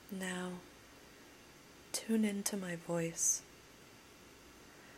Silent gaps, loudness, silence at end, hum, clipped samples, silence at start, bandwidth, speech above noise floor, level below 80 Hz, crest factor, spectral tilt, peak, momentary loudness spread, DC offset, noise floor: none; -37 LUFS; 0 s; none; under 0.1%; 0 s; 16 kHz; 23 dB; -72 dBFS; 22 dB; -3.5 dB/octave; -20 dBFS; 24 LU; under 0.1%; -59 dBFS